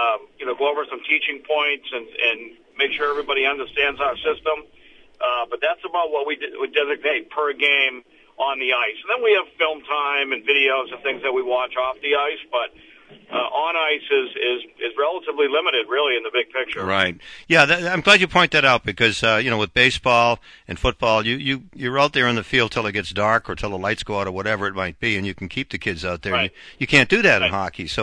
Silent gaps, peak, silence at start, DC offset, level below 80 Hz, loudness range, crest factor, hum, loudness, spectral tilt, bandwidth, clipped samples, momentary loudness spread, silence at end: none; 0 dBFS; 0 s; under 0.1%; -46 dBFS; 7 LU; 20 dB; none; -20 LUFS; -4 dB/octave; 10.5 kHz; under 0.1%; 10 LU; 0 s